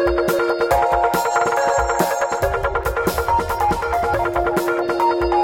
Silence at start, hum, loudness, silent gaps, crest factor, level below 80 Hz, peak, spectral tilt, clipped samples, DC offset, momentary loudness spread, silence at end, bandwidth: 0 s; none; -19 LUFS; none; 16 dB; -34 dBFS; -2 dBFS; -5 dB/octave; under 0.1%; 0.1%; 3 LU; 0 s; 17 kHz